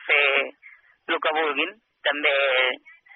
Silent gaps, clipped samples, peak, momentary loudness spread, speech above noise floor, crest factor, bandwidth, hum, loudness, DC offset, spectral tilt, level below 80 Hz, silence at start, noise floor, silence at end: none; under 0.1%; -6 dBFS; 12 LU; 29 dB; 18 dB; 4.2 kHz; none; -22 LUFS; under 0.1%; 4 dB/octave; -82 dBFS; 0 s; -52 dBFS; 0.4 s